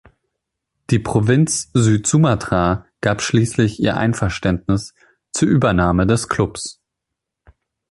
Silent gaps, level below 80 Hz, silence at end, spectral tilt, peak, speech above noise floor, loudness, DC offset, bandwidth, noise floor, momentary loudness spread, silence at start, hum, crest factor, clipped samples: none; -38 dBFS; 1.2 s; -5.5 dB/octave; -2 dBFS; 64 dB; -17 LUFS; under 0.1%; 11.5 kHz; -81 dBFS; 7 LU; 0.9 s; none; 16 dB; under 0.1%